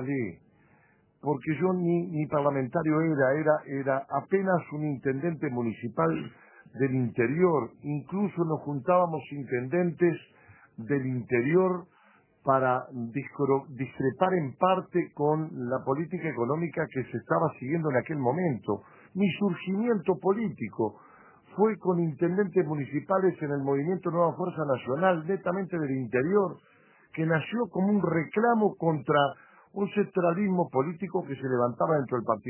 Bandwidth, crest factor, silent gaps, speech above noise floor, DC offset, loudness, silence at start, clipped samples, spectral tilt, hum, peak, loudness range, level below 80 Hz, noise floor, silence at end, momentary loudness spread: 3.2 kHz; 20 dB; none; 36 dB; under 0.1%; -28 LUFS; 0 s; under 0.1%; -11.5 dB/octave; none; -8 dBFS; 2 LU; -68 dBFS; -64 dBFS; 0 s; 8 LU